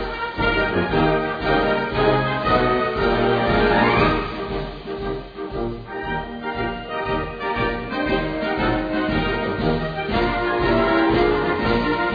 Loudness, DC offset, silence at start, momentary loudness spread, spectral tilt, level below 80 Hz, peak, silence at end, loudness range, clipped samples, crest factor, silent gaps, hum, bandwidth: -21 LUFS; under 0.1%; 0 s; 10 LU; -8 dB/octave; -34 dBFS; -4 dBFS; 0 s; 7 LU; under 0.1%; 18 dB; none; none; 5 kHz